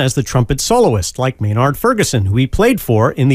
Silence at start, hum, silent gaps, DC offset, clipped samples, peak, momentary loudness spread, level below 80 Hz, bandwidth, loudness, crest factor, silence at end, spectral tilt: 0 s; none; none; under 0.1%; under 0.1%; -2 dBFS; 4 LU; -30 dBFS; 16 kHz; -14 LUFS; 12 dB; 0 s; -5.5 dB/octave